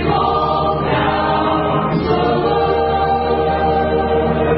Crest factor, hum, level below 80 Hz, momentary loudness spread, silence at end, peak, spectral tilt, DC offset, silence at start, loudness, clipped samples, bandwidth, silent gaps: 12 dB; none; -30 dBFS; 1 LU; 0 s; -4 dBFS; -12 dB/octave; under 0.1%; 0 s; -16 LUFS; under 0.1%; 5.8 kHz; none